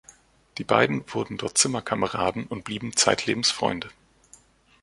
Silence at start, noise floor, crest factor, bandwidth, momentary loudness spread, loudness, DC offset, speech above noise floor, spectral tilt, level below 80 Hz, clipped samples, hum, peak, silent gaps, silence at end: 0.55 s; -56 dBFS; 24 dB; 11.5 kHz; 12 LU; -24 LUFS; under 0.1%; 31 dB; -2.5 dB/octave; -58 dBFS; under 0.1%; none; -2 dBFS; none; 0.9 s